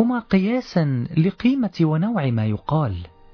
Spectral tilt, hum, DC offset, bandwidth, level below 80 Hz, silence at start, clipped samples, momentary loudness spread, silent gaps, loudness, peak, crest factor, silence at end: -9 dB/octave; none; under 0.1%; 5.4 kHz; -48 dBFS; 0 s; under 0.1%; 4 LU; none; -21 LUFS; -6 dBFS; 14 dB; 0.25 s